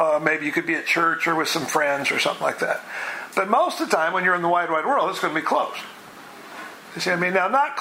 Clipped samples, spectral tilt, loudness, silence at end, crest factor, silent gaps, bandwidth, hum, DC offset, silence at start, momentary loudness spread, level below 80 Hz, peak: under 0.1%; -3.5 dB/octave; -22 LUFS; 0 s; 20 dB; none; 16 kHz; none; under 0.1%; 0 s; 17 LU; -74 dBFS; -4 dBFS